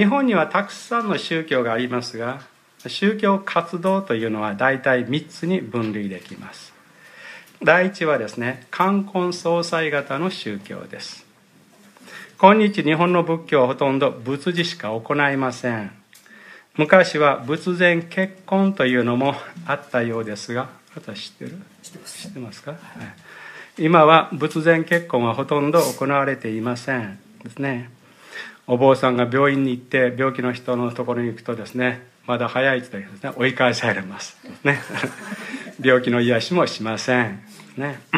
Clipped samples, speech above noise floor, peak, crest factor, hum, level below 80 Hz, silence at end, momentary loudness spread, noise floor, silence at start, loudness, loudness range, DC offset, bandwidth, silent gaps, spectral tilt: under 0.1%; 33 dB; 0 dBFS; 22 dB; none; -68 dBFS; 0 s; 19 LU; -53 dBFS; 0 s; -20 LUFS; 5 LU; under 0.1%; 15.5 kHz; none; -5.5 dB/octave